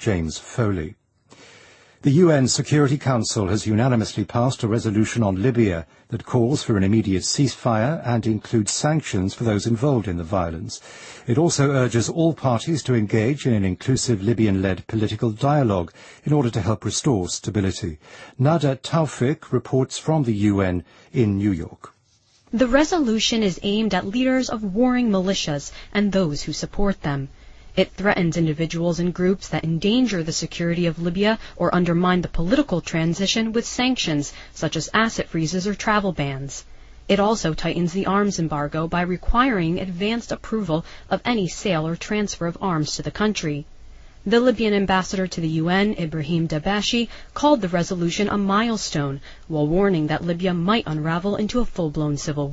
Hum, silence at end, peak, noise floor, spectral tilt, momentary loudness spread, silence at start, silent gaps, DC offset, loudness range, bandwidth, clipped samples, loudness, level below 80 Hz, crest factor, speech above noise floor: none; 0 s; -4 dBFS; -60 dBFS; -5.5 dB/octave; 7 LU; 0 s; none; under 0.1%; 2 LU; 8.8 kHz; under 0.1%; -22 LUFS; -40 dBFS; 18 dB; 39 dB